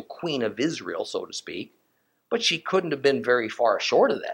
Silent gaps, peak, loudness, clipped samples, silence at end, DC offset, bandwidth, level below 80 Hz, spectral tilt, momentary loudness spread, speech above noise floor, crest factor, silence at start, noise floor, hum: none; -6 dBFS; -25 LUFS; under 0.1%; 0 s; under 0.1%; 16.5 kHz; -76 dBFS; -3.5 dB/octave; 13 LU; 46 dB; 18 dB; 0 s; -70 dBFS; none